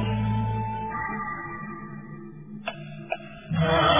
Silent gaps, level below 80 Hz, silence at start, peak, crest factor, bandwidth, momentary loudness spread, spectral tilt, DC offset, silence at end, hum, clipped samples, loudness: none; -44 dBFS; 0 s; -8 dBFS; 20 dB; 3.8 kHz; 14 LU; -10 dB/octave; 0.3%; 0 s; none; under 0.1%; -30 LUFS